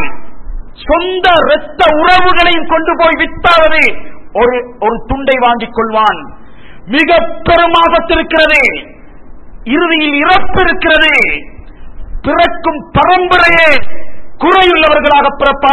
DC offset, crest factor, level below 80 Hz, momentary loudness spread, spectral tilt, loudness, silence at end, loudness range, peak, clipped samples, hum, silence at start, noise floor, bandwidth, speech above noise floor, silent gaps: under 0.1%; 10 dB; -28 dBFS; 9 LU; -5 dB/octave; -9 LUFS; 0 s; 3 LU; 0 dBFS; 0.3%; none; 0 s; -35 dBFS; 12 kHz; 27 dB; none